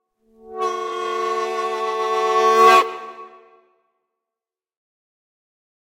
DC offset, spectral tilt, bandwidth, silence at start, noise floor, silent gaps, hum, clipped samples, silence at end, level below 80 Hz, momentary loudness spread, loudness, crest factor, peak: under 0.1%; -1.5 dB/octave; 16.5 kHz; 0.45 s; -89 dBFS; none; none; under 0.1%; 2.7 s; -74 dBFS; 16 LU; -18 LUFS; 20 dB; -2 dBFS